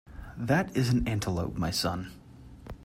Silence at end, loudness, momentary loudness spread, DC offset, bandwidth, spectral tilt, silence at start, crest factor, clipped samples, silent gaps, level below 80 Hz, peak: 0 s; -29 LUFS; 19 LU; under 0.1%; 16 kHz; -5.5 dB/octave; 0.05 s; 18 dB; under 0.1%; none; -46 dBFS; -12 dBFS